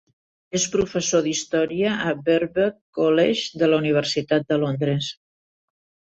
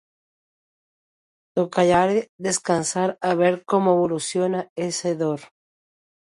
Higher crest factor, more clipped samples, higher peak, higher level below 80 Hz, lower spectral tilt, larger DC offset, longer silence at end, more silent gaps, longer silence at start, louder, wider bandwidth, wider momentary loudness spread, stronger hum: about the same, 16 dB vs 18 dB; neither; about the same, -6 dBFS vs -6 dBFS; about the same, -58 dBFS vs -60 dBFS; about the same, -4.5 dB/octave vs -4.5 dB/octave; neither; first, 1 s vs 0.75 s; about the same, 2.81-2.93 s vs 2.29-2.39 s, 4.70-4.76 s; second, 0.55 s vs 1.55 s; about the same, -22 LUFS vs -22 LUFS; second, 8.2 kHz vs 11.5 kHz; second, 5 LU vs 8 LU; neither